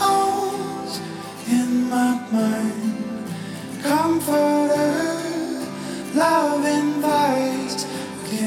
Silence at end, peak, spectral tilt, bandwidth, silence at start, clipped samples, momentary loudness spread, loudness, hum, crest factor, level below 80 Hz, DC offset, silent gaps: 0 s; -6 dBFS; -4.5 dB/octave; 17 kHz; 0 s; under 0.1%; 11 LU; -22 LUFS; none; 16 dB; -64 dBFS; under 0.1%; none